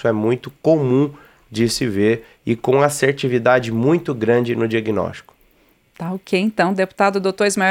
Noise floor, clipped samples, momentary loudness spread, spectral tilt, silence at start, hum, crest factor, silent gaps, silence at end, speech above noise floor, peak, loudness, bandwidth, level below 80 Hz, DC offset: -57 dBFS; under 0.1%; 8 LU; -5.5 dB/octave; 0 s; none; 16 dB; none; 0 s; 39 dB; -2 dBFS; -18 LUFS; 16.5 kHz; -54 dBFS; under 0.1%